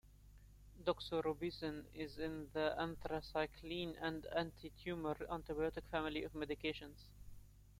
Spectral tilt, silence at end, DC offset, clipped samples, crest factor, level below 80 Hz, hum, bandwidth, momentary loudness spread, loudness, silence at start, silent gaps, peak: -6 dB/octave; 0.05 s; under 0.1%; under 0.1%; 20 dB; -60 dBFS; 50 Hz at -60 dBFS; 16.5 kHz; 9 LU; -44 LUFS; 0.05 s; none; -24 dBFS